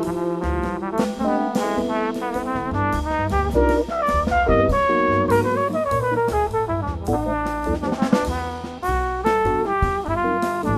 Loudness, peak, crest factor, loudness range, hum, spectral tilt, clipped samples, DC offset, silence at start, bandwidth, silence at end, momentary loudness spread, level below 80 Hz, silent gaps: -21 LUFS; -4 dBFS; 16 dB; 3 LU; none; -7 dB/octave; under 0.1%; under 0.1%; 0 s; 14 kHz; 0 s; 6 LU; -32 dBFS; none